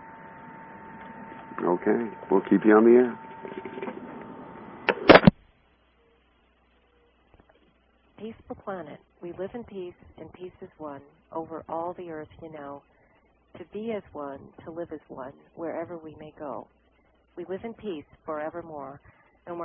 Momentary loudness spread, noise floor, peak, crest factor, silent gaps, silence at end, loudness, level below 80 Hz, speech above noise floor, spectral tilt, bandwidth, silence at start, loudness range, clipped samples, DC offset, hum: 24 LU; -64 dBFS; -2 dBFS; 26 dB; none; 0 s; -25 LUFS; -52 dBFS; 36 dB; -3 dB/octave; 3.7 kHz; 0 s; 17 LU; under 0.1%; under 0.1%; none